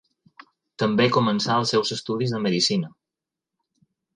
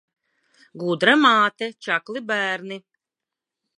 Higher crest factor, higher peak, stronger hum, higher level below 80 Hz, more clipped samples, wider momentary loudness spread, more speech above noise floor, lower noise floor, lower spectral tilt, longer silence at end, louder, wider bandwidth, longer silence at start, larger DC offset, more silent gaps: about the same, 18 dB vs 22 dB; second, -6 dBFS vs -2 dBFS; neither; first, -64 dBFS vs -80 dBFS; neither; second, 7 LU vs 15 LU; about the same, 65 dB vs 66 dB; about the same, -87 dBFS vs -87 dBFS; about the same, -4.5 dB/octave vs -4.5 dB/octave; first, 1.25 s vs 1 s; about the same, -22 LUFS vs -20 LUFS; about the same, 10.5 kHz vs 11 kHz; about the same, 0.8 s vs 0.75 s; neither; neither